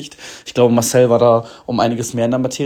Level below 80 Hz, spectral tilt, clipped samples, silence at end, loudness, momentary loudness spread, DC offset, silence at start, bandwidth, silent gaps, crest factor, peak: -54 dBFS; -5.5 dB/octave; under 0.1%; 0 s; -15 LUFS; 12 LU; under 0.1%; 0 s; 19 kHz; none; 14 dB; 0 dBFS